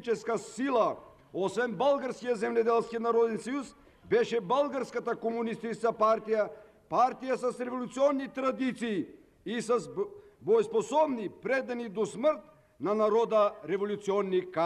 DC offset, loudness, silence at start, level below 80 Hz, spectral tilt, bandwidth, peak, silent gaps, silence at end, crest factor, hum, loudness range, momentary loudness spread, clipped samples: under 0.1%; -30 LUFS; 0 s; -70 dBFS; -5.5 dB/octave; 11.5 kHz; -16 dBFS; none; 0 s; 14 dB; none; 2 LU; 9 LU; under 0.1%